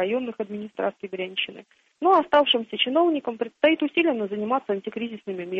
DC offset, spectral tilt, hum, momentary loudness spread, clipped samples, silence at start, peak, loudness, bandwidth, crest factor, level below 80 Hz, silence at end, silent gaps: under 0.1%; -6.5 dB/octave; none; 13 LU; under 0.1%; 0 s; -8 dBFS; -24 LUFS; 6.2 kHz; 18 dB; -70 dBFS; 0 s; none